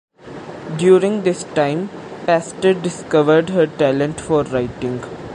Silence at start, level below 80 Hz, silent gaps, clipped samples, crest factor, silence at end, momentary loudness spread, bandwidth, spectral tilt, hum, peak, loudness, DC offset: 0.25 s; -50 dBFS; none; under 0.1%; 16 dB; 0 s; 15 LU; 10.5 kHz; -6 dB/octave; none; -2 dBFS; -17 LUFS; under 0.1%